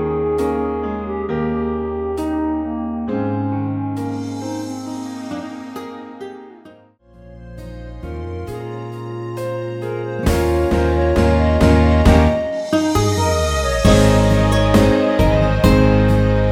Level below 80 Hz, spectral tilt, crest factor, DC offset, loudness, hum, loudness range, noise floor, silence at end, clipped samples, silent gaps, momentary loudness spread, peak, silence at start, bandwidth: -24 dBFS; -6.5 dB/octave; 18 dB; under 0.1%; -17 LUFS; none; 17 LU; -47 dBFS; 0 s; under 0.1%; none; 17 LU; 0 dBFS; 0 s; 16.5 kHz